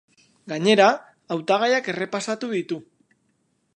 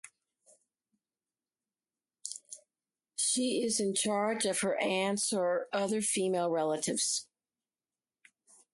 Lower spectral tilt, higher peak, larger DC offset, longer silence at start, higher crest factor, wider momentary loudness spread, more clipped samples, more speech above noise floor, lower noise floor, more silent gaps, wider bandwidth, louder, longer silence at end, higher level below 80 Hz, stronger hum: first, -4.5 dB/octave vs -2.5 dB/octave; first, -2 dBFS vs -16 dBFS; neither; first, 0.45 s vs 0.05 s; about the same, 20 dB vs 18 dB; about the same, 15 LU vs 13 LU; neither; second, 48 dB vs over 59 dB; second, -69 dBFS vs under -90 dBFS; neither; about the same, 11.5 kHz vs 12 kHz; first, -22 LUFS vs -31 LUFS; second, 0.95 s vs 1.5 s; about the same, -78 dBFS vs -80 dBFS; neither